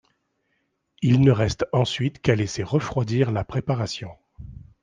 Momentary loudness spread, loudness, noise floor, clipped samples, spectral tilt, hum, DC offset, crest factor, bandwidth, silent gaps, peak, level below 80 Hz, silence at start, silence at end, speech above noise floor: 18 LU; -23 LUFS; -73 dBFS; under 0.1%; -6.5 dB/octave; none; under 0.1%; 20 dB; 9.4 kHz; none; -4 dBFS; -48 dBFS; 1 s; 0.2 s; 51 dB